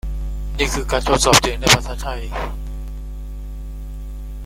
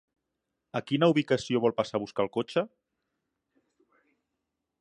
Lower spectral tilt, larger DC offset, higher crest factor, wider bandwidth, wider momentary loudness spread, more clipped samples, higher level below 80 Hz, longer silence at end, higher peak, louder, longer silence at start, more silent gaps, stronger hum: second, -3 dB/octave vs -6 dB/octave; neither; about the same, 20 dB vs 22 dB; first, 16.5 kHz vs 10.5 kHz; first, 20 LU vs 11 LU; neither; first, -26 dBFS vs -70 dBFS; second, 0 s vs 2.15 s; first, 0 dBFS vs -10 dBFS; first, -18 LUFS vs -28 LUFS; second, 0.05 s vs 0.75 s; neither; first, 50 Hz at -25 dBFS vs none